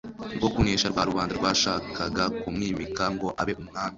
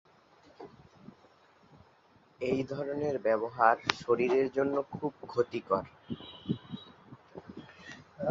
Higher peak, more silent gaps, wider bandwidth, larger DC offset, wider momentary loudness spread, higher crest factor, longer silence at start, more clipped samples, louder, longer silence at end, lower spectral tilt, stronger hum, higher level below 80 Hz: second, -8 dBFS vs -4 dBFS; neither; about the same, 7.8 kHz vs 7.6 kHz; neither; second, 7 LU vs 23 LU; second, 20 dB vs 30 dB; second, 0.05 s vs 0.6 s; neither; first, -27 LUFS vs -32 LUFS; about the same, 0 s vs 0 s; second, -4 dB/octave vs -6 dB/octave; neither; first, -44 dBFS vs -66 dBFS